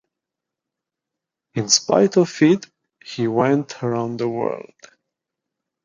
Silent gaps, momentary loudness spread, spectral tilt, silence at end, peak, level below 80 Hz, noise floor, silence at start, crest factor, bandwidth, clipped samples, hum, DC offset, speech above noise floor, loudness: none; 12 LU; -4 dB/octave; 1.25 s; -2 dBFS; -64 dBFS; -85 dBFS; 1.55 s; 20 dB; 9.6 kHz; under 0.1%; none; under 0.1%; 66 dB; -19 LUFS